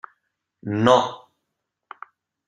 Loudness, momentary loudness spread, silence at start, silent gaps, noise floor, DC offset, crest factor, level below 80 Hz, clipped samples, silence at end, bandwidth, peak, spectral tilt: -20 LUFS; 25 LU; 0.65 s; none; -80 dBFS; under 0.1%; 24 dB; -64 dBFS; under 0.1%; 1.3 s; 10 kHz; -2 dBFS; -5.5 dB/octave